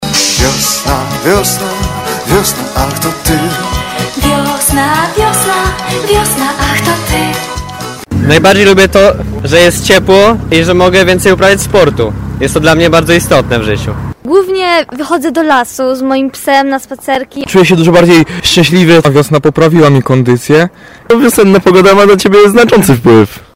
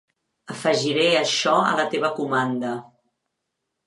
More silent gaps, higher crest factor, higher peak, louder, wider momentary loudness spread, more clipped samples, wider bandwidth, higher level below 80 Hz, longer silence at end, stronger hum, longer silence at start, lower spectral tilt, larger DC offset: neither; second, 8 dB vs 18 dB; first, 0 dBFS vs -6 dBFS; first, -8 LUFS vs -21 LUFS; about the same, 10 LU vs 10 LU; first, 3% vs under 0.1%; first, 16.5 kHz vs 11.5 kHz; first, -26 dBFS vs -76 dBFS; second, 0.15 s vs 1.05 s; neither; second, 0 s vs 0.5 s; about the same, -4.5 dB/octave vs -3.5 dB/octave; neither